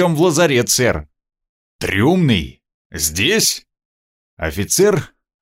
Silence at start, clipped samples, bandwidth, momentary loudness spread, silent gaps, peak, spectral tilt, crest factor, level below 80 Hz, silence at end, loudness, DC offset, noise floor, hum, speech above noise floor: 0 s; under 0.1%; 16.5 kHz; 13 LU; 1.49-1.79 s, 2.74-2.90 s, 3.85-4.37 s; -2 dBFS; -4 dB/octave; 16 dB; -40 dBFS; 0.35 s; -16 LUFS; under 0.1%; under -90 dBFS; none; over 75 dB